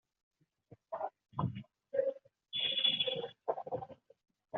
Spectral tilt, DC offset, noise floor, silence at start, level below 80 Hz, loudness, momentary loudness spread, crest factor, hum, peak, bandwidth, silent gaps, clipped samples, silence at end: -2 dB/octave; under 0.1%; -64 dBFS; 0.7 s; -74 dBFS; -36 LUFS; 17 LU; 20 dB; none; -18 dBFS; 5 kHz; none; under 0.1%; 0 s